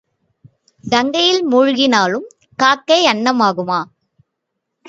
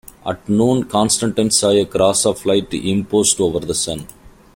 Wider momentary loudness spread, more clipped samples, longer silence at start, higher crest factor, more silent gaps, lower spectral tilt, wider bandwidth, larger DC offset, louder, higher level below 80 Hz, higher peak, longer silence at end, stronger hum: first, 12 LU vs 7 LU; neither; first, 0.85 s vs 0.25 s; about the same, 16 dB vs 16 dB; neither; about the same, -3.5 dB/octave vs -4 dB/octave; second, 7.8 kHz vs 16.5 kHz; neither; about the same, -14 LUFS vs -16 LUFS; second, -62 dBFS vs -46 dBFS; about the same, 0 dBFS vs -2 dBFS; first, 1.05 s vs 0.25 s; neither